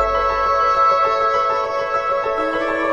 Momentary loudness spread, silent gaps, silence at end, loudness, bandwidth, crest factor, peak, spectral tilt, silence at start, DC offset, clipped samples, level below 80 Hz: 5 LU; none; 0 s; -17 LUFS; 9.6 kHz; 12 dB; -6 dBFS; -4.5 dB/octave; 0 s; under 0.1%; under 0.1%; -40 dBFS